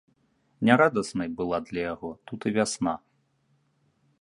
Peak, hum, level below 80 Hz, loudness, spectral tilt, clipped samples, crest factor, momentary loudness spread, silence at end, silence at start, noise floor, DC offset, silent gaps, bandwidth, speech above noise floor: -2 dBFS; none; -60 dBFS; -27 LUFS; -5 dB/octave; under 0.1%; 26 dB; 14 LU; 1.25 s; 0.6 s; -69 dBFS; under 0.1%; none; 11.5 kHz; 43 dB